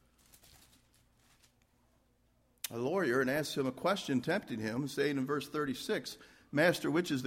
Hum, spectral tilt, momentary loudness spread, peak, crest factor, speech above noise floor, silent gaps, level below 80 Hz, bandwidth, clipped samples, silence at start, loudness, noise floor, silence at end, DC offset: none; -5 dB/octave; 8 LU; -14 dBFS; 22 dB; 38 dB; none; -70 dBFS; 16 kHz; under 0.1%; 2.65 s; -34 LUFS; -72 dBFS; 0 s; under 0.1%